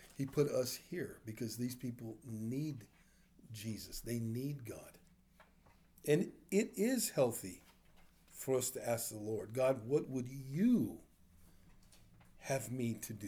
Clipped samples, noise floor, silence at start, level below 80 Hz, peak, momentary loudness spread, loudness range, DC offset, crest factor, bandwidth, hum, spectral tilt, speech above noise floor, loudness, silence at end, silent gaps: under 0.1%; -67 dBFS; 0 s; -66 dBFS; -20 dBFS; 15 LU; 7 LU; under 0.1%; 20 dB; over 20 kHz; none; -5.5 dB/octave; 29 dB; -39 LUFS; 0 s; none